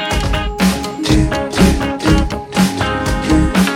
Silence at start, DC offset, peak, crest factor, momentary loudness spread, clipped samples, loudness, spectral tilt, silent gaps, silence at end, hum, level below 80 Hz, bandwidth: 0 s; under 0.1%; 0 dBFS; 14 dB; 4 LU; under 0.1%; -15 LUFS; -5.5 dB/octave; none; 0 s; none; -22 dBFS; 16.5 kHz